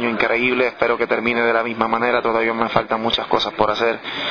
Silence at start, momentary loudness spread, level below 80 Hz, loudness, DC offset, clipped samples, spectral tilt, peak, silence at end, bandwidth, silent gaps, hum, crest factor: 0 s; 3 LU; -52 dBFS; -18 LUFS; 0.2%; under 0.1%; -5.5 dB/octave; 0 dBFS; 0 s; 5.4 kHz; none; none; 18 dB